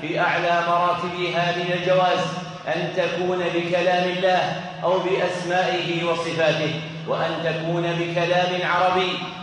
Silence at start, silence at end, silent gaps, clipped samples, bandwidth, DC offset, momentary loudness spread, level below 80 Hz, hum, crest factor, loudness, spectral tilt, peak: 0 s; 0 s; none; under 0.1%; 10 kHz; under 0.1%; 6 LU; -64 dBFS; none; 14 dB; -22 LUFS; -5 dB/octave; -8 dBFS